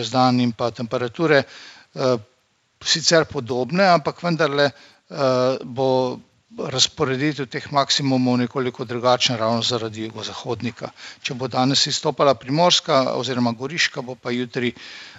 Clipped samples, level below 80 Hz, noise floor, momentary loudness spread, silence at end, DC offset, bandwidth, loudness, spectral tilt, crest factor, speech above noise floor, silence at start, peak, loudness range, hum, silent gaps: under 0.1%; -62 dBFS; -64 dBFS; 13 LU; 0 s; under 0.1%; 8 kHz; -20 LUFS; -4 dB/octave; 20 dB; 43 dB; 0 s; -2 dBFS; 3 LU; none; none